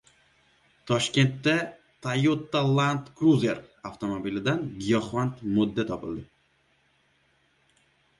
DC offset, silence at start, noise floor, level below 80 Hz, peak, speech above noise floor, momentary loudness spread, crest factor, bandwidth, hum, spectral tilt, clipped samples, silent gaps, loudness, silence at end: under 0.1%; 0.85 s; -67 dBFS; -60 dBFS; -10 dBFS; 41 dB; 12 LU; 18 dB; 11.5 kHz; none; -6 dB/octave; under 0.1%; none; -26 LUFS; 1.95 s